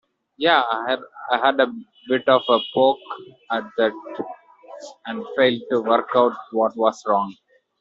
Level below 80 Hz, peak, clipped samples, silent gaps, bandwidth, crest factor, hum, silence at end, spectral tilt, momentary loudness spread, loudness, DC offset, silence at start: -68 dBFS; -2 dBFS; under 0.1%; none; 7.6 kHz; 18 dB; none; 0.45 s; -1.5 dB/octave; 15 LU; -21 LUFS; under 0.1%; 0.4 s